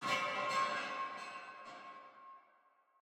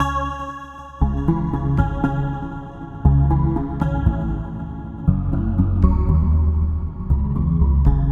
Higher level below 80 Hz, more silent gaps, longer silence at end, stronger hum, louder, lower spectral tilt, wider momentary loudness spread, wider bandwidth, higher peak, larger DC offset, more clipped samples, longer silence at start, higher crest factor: second, -90 dBFS vs -22 dBFS; neither; first, 0.6 s vs 0 s; neither; second, -38 LUFS vs -20 LUFS; second, -2 dB/octave vs -9.5 dB/octave; first, 21 LU vs 13 LU; first, 18 kHz vs 6.6 kHz; second, -24 dBFS vs -2 dBFS; neither; neither; about the same, 0 s vs 0 s; about the same, 18 dB vs 16 dB